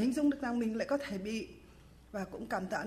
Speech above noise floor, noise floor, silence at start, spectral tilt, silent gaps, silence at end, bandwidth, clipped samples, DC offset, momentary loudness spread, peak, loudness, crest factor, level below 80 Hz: 22 dB; -57 dBFS; 0 s; -5.5 dB/octave; none; 0 s; 15.5 kHz; under 0.1%; under 0.1%; 11 LU; -22 dBFS; -36 LUFS; 14 dB; -60 dBFS